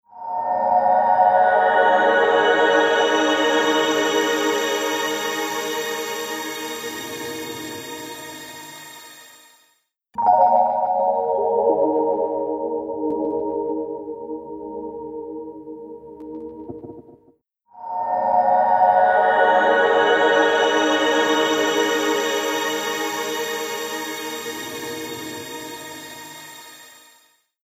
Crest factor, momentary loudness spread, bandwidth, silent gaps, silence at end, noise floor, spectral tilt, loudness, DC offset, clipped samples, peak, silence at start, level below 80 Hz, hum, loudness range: 18 dB; 19 LU; 16 kHz; none; 0.75 s; -65 dBFS; -2 dB/octave; -19 LUFS; under 0.1%; under 0.1%; -4 dBFS; 0.15 s; -64 dBFS; none; 15 LU